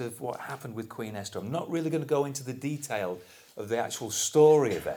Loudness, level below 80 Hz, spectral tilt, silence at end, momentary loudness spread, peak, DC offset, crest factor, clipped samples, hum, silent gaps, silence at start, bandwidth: -29 LUFS; -68 dBFS; -4.5 dB/octave; 0 s; 17 LU; -8 dBFS; under 0.1%; 20 dB; under 0.1%; none; none; 0 s; over 20 kHz